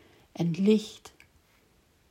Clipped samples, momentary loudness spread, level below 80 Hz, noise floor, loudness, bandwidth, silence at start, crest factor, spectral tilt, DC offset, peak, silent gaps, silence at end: under 0.1%; 23 LU; -70 dBFS; -65 dBFS; -27 LUFS; 13 kHz; 0.4 s; 18 dB; -7 dB/octave; under 0.1%; -12 dBFS; none; 1 s